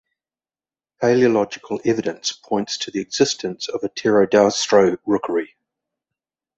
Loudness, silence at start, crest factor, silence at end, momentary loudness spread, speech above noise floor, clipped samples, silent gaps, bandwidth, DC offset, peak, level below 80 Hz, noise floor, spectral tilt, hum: -19 LUFS; 1 s; 18 dB; 1.1 s; 10 LU; over 71 dB; under 0.1%; none; 8.2 kHz; under 0.1%; -2 dBFS; -60 dBFS; under -90 dBFS; -4 dB/octave; none